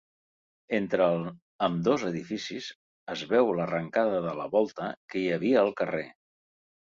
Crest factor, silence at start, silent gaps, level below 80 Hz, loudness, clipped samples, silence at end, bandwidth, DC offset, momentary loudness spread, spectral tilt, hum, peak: 18 dB; 0.7 s; 1.42-1.59 s, 2.75-3.07 s, 4.97-5.08 s; -68 dBFS; -28 LUFS; under 0.1%; 0.7 s; 7.6 kHz; under 0.1%; 13 LU; -6 dB/octave; none; -10 dBFS